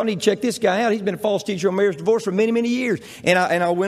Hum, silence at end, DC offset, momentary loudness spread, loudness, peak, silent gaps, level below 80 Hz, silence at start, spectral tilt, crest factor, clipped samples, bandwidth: none; 0 s; under 0.1%; 4 LU; -20 LUFS; -4 dBFS; none; -64 dBFS; 0 s; -5 dB/octave; 16 dB; under 0.1%; 15 kHz